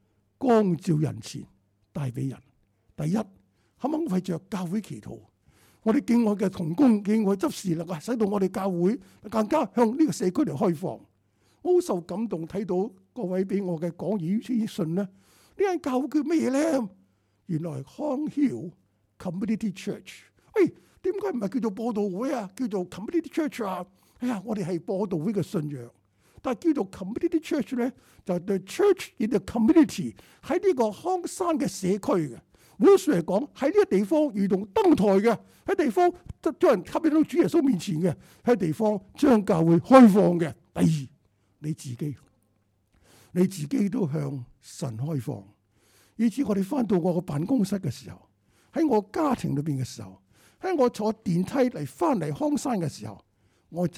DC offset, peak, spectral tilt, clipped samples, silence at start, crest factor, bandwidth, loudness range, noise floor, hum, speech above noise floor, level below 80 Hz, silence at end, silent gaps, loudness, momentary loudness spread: under 0.1%; -2 dBFS; -7 dB/octave; under 0.1%; 0.4 s; 24 dB; 15 kHz; 9 LU; -69 dBFS; none; 44 dB; -60 dBFS; 0 s; none; -26 LUFS; 14 LU